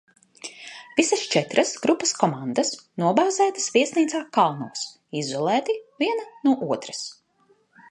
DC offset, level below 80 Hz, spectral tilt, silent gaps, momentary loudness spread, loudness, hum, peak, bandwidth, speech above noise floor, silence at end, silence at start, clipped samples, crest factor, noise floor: under 0.1%; -74 dBFS; -3.5 dB/octave; none; 12 LU; -23 LUFS; none; -2 dBFS; 11.5 kHz; 40 dB; 0.8 s; 0.45 s; under 0.1%; 22 dB; -63 dBFS